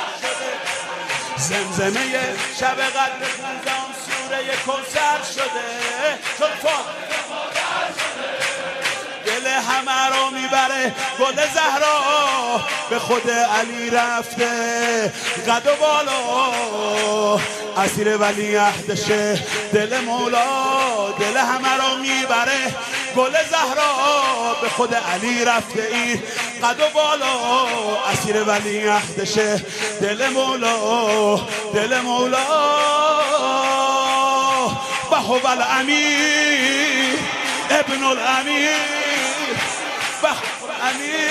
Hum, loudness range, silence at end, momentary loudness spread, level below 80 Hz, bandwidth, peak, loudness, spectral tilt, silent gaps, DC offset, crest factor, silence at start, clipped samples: none; 5 LU; 0 s; 7 LU; -62 dBFS; 15.5 kHz; -2 dBFS; -19 LUFS; -2 dB/octave; none; under 0.1%; 16 dB; 0 s; under 0.1%